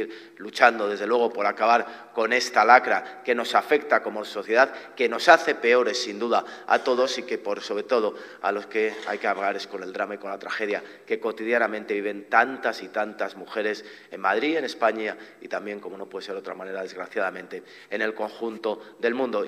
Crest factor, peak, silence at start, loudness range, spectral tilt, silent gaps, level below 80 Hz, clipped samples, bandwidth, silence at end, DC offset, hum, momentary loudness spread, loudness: 24 dB; 0 dBFS; 0 s; 9 LU; -3 dB/octave; none; -82 dBFS; under 0.1%; 14.5 kHz; 0 s; under 0.1%; none; 14 LU; -24 LUFS